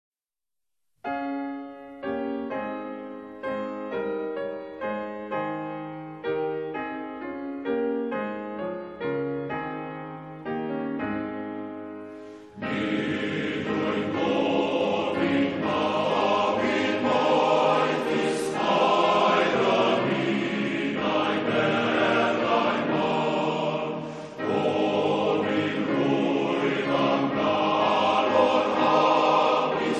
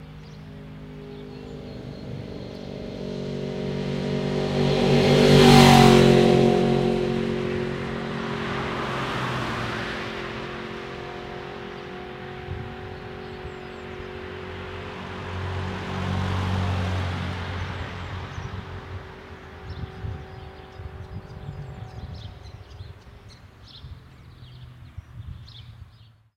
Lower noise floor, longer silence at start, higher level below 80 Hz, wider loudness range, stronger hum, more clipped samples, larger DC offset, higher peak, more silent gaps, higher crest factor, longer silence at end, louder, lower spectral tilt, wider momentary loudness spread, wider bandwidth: first, -86 dBFS vs -52 dBFS; first, 1.05 s vs 0 s; second, -62 dBFS vs -42 dBFS; second, 10 LU vs 24 LU; neither; neither; neither; second, -8 dBFS vs 0 dBFS; neither; second, 18 dB vs 24 dB; second, 0 s vs 0.55 s; second, -25 LUFS vs -22 LUFS; about the same, -5.5 dB/octave vs -6 dB/octave; second, 14 LU vs 24 LU; second, 12 kHz vs 16 kHz